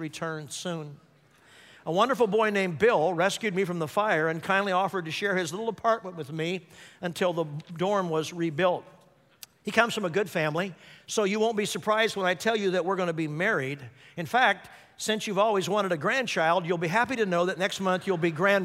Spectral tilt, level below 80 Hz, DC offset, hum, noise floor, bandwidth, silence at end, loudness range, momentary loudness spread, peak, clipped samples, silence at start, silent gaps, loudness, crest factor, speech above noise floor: -4.5 dB/octave; -72 dBFS; under 0.1%; none; -58 dBFS; 16 kHz; 0 s; 4 LU; 11 LU; -8 dBFS; under 0.1%; 0 s; none; -27 LUFS; 20 dB; 31 dB